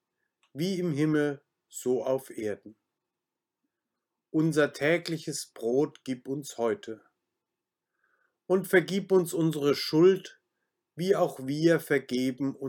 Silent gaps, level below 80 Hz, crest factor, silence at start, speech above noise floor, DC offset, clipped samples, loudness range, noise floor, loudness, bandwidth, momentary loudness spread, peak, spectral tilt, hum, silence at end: none; -80 dBFS; 20 dB; 0.55 s; 61 dB; under 0.1%; under 0.1%; 7 LU; -88 dBFS; -28 LUFS; 19 kHz; 12 LU; -10 dBFS; -5.5 dB/octave; none; 0 s